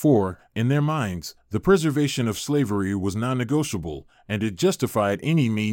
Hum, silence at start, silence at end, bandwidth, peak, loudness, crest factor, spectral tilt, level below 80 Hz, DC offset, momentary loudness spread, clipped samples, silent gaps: none; 0 s; 0 s; 17 kHz; -6 dBFS; -23 LUFS; 16 dB; -6 dB/octave; -50 dBFS; under 0.1%; 10 LU; under 0.1%; none